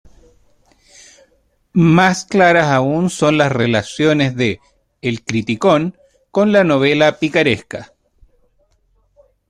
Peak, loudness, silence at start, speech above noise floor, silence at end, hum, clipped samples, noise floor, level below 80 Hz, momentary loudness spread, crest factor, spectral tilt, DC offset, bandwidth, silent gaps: 0 dBFS; -15 LUFS; 1.75 s; 45 dB; 1.65 s; none; under 0.1%; -59 dBFS; -50 dBFS; 11 LU; 16 dB; -6 dB/octave; under 0.1%; 11 kHz; none